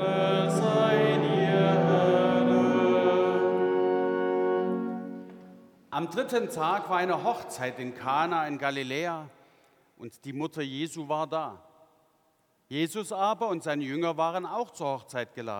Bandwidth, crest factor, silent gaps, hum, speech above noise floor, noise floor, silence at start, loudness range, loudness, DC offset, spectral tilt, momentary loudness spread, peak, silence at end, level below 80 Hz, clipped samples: 17.5 kHz; 16 dB; none; none; 39 dB; -69 dBFS; 0 s; 11 LU; -27 LUFS; under 0.1%; -6 dB/octave; 13 LU; -12 dBFS; 0 s; -78 dBFS; under 0.1%